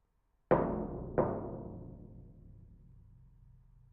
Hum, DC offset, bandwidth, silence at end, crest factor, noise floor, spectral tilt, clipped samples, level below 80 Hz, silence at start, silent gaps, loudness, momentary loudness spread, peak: none; under 0.1%; 4.1 kHz; 0.45 s; 24 dB; -75 dBFS; -9 dB/octave; under 0.1%; -54 dBFS; 0.5 s; none; -35 LUFS; 25 LU; -14 dBFS